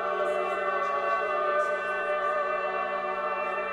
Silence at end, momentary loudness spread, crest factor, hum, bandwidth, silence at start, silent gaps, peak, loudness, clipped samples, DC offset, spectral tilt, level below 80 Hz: 0 s; 3 LU; 14 dB; none; 11 kHz; 0 s; none; -14 dBFS; -28 LUFS; under 0.1%; under 0.1%; -4 dB/octave; -66 dBFS